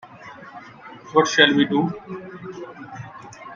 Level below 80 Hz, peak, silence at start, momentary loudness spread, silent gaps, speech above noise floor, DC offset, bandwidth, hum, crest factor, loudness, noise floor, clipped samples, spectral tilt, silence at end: -64 dBFS; 0 dBFS; 0.15 s; 25 LU; none; 23 dB; under 0.1%; 7.6 kHz; none; 24 dB; -18 LUFS; -42 dBFS; under 0.1%; -4 dB/octave; 0 s